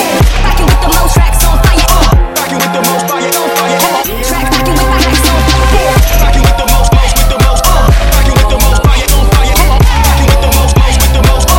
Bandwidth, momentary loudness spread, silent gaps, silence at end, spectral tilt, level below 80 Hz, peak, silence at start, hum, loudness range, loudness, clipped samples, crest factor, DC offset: 17.5 kHz; 3 LU; none; 0 s; -4 dB/octave; -8 dBFS; 0 dBFS; 0 s; none; 2 LU; -9 LUFS; 0.5%; 6 dB; under 0.1%